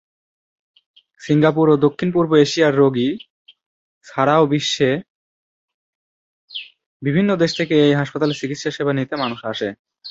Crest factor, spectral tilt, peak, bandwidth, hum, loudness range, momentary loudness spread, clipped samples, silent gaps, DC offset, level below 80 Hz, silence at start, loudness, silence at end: 18 dB; -6 dB/octave; -2 dBFS; 8 kHz; none; 4 LU; 15 LU; under 0.1%; 3.30-3.45 s, 3.66-4.01 s, 5.09-5.68 s, 5.74-6.48 s, 6.86-7.00 s, 9.79-9.85 s; under 0.1%; -60 dBFS; 1.2 s; -18 LUFS; 0 s